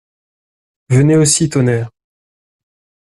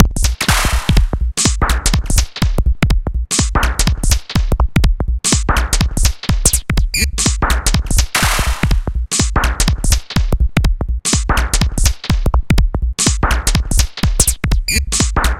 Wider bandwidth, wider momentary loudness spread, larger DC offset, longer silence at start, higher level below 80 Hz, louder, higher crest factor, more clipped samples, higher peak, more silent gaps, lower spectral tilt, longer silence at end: second, 12.5 kHz vs 16.5 kHz; first, 10 LU vs 4 LU; neither; first, 0.9 s vs 0 s; second, -48 dBFS vs -16 dBFS; first, -13 LUFS vs -16 LUFS; about the same, 16 dB vs 14 dB; neither; about the same, 0 dBFS vs 0 dBFS; neither; first, -5 dB/octave vs -3.5 dB/octave; first, 1.25 s vs 0 s